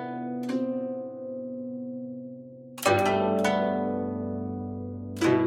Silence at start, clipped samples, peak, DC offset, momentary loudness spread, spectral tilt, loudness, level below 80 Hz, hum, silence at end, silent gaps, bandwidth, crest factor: 0 s; under 0.1%; -10 dBFS; under 0.1%; 13 LU; -5.5 dB/octave; -29 LUFS; -66 dBFS; none; 0 s; none; 16 kHz; 20 dB